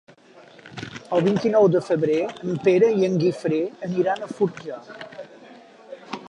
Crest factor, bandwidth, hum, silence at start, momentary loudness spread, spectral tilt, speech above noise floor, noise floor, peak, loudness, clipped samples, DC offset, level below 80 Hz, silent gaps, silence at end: 16 dB; 10.5 kHz; none; 0.65 s; 21 LU; -7.5 dB/octave; 28 dB; -49 dBFS; -6 dBFS; -21 LUFS; under 0.1%; under 0.1%; -66 dBFS; none; 0 s